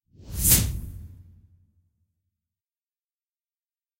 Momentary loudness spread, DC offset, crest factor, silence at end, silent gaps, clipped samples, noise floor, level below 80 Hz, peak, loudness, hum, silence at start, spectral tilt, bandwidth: 23 LU; under 0.1%; 26 dB; 2.8 s; none; under 0.1%; under -90 dBFS; -38 dBFS; -4 dBFS; -20 LUFS; none; 0.25 s; -2.5 dB/octave; 16 kHz